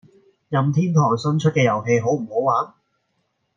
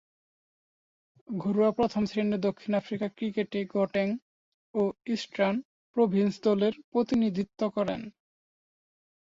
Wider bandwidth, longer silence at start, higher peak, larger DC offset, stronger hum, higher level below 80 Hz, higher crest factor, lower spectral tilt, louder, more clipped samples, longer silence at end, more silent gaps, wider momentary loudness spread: about the same, 7.4 kHz vs 7.6 kHz; second, 0.5 s vs 1.3 s; first, -4 dBFS vs -12 dBFS; neither; neither; about the same, -64 dBFS vs -66 dBFS; about the same, 16 dB vs 18 dB; about the same, -7 dB/octave vs -7 dB/octave; first, -20 LUFS vs -29 LUFS; neither; second, 0.9 s vs 1.15 s; second, none vs 4.22-4.74 s, 5.65-5.94 s, 6.84-6.92 s; second, 5 LU vs 9 LU